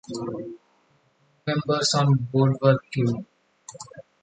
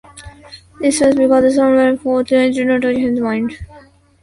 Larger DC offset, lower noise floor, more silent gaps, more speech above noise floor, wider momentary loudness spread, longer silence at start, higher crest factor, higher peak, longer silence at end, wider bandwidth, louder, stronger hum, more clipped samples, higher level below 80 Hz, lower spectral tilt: neither; first, -64 dBFS vs -44 dBFS; neither; first, 41 dB vs 31 dB; first, 22 LU vs 8 LU; about the same, 0.1 s vs 0.15 s; about the same, 18 dB vs 14 dB; second, -6 dBFS vs 0 dBFS; second, 0.2 s vs 0.45 s; second, 9.4 kHz vs 11.5 kHz; second, -23 LUFS vs -14 LUFS; neither; neither; second, -62 dBFS vs -44 dBFS; about the same, -5.5 dB/octave vs -4.5 dB/octave